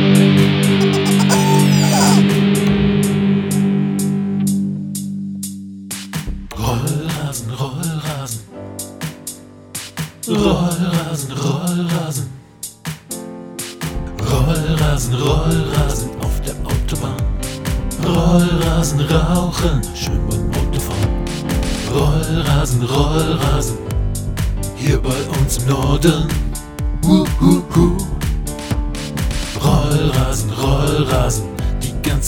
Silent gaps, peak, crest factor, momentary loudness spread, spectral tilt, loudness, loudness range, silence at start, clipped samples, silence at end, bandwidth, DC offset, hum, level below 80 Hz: none; 0 dBFS; 16 dB; 14 LU; -5.5 dB/octave; -17 LUFS; 9 LU; 0 s; under 0.1%; 0 s; 20 kHz; under 0.1%; none; -24 dBFS